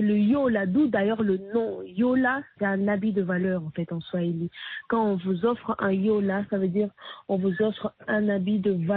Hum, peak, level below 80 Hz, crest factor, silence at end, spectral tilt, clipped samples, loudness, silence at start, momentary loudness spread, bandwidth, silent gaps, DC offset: none; -12 dBFS; -62 dBFS; 14 dB; 0 s; -6.5 dB/octave; under 0.1%; -26 LUFS; 0 s; 8 LU; 4.3 kHz; none; under 0.1%